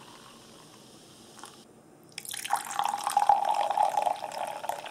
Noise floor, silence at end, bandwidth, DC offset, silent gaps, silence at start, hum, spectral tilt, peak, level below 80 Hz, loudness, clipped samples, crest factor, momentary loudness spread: -55 dBFS; 0 s; 16 kHz; under 0.1%; none; 0 s; none; -1 dB/octave; -8 dBFS; -76 dBFS; -29 LUFS; under 0.1%; 24 dB; 26 LU